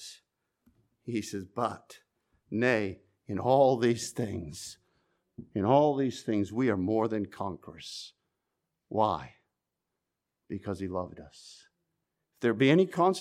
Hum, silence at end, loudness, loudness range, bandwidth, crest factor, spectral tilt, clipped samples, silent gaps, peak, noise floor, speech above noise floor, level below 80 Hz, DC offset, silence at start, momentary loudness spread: none; 0 s; -29 LUFS; 8 LU; 15 kHz; 20 dB; -6 dB/octave; under 0.1%; none; -10 dBFS; -86 dBFS; 57 dB; -66 dBFS; under 0.1%; 0 s; 20 LU